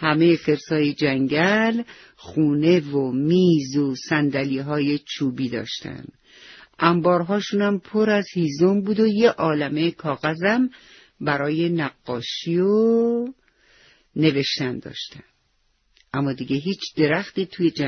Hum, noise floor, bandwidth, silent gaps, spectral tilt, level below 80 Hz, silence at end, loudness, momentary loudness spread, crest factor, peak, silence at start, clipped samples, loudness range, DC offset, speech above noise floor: none; -66 dBFS; 6.6 kHz; none; -6.5 dB/octave; -60 dBFS; 0 s; -21 LUFS; 11 LU; 20 dB; -2 dBFS; 0 s; under 0.1%; 5 LU; under 0.1%; 45 dB